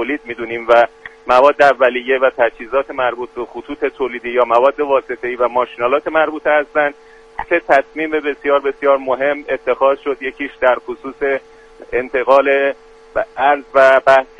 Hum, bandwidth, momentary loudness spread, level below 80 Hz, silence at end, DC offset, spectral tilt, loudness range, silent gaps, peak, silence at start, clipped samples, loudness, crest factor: none; 9 kHz; 12 LU; -50 dBFS; 0.15 s; under 0.1%; -4.5 dB/octave; 3 LU; none; 0 dBFS; 0 s; under 0.1%; -15 LUFS; 16 dB